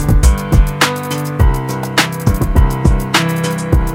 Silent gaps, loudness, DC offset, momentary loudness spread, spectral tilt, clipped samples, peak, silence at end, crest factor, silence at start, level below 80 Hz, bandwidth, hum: none; -14 LUFS; under 0.1%; 5 LU; -5 dB/octave; 0.2%; 0 dBFS; 0 s; 12 dB; 0 s; -16 dBFS; 17 kHz; none